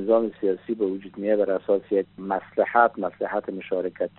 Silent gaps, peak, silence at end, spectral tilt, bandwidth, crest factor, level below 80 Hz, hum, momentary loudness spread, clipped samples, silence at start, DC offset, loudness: none; -4 dBFS; 0.1 s; -5 dB/octave; 4.2 kHz; 20 dB; -70 dBFS; none; 9 LU; under 0.1%; 0 s; under 0.1%; -25 LUFS